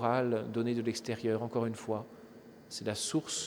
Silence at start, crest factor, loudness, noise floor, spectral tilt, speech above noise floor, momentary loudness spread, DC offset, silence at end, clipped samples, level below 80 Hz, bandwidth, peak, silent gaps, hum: 0 s; 18 dB; -35 LUFS; -54 dBFS; -4.5 dB/octave; 20 dB; 18 LU; under 0.1%; 0 s; under 0.1%; -74 dBFS; 19.5 kHz; -16 dBFS; none; none